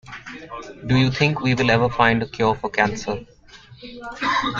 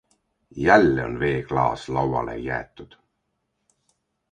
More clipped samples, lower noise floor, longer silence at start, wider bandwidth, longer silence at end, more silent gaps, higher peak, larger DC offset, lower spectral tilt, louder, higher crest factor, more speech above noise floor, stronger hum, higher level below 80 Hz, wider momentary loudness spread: neither; second, -46 dBFS vs -76 dBFS; second, 0.05 s vs 0.55 s; second, 7.6 kHz vs 10 kHz; second, 0 s vs 1.5 s; neither; about the same, -2 dBFS vs 0 dBFS; neither; about the same, -6 dB/octave vs -7 dB/octave; about the same, -20 LUFS vs -22 LUFS; about the same, 20 dB vs 24 dB; second, 25 dB vs 54 dB; neither; about the same, -46 dBFS vs -46 dBFS; first, 18 LU vs 14 LU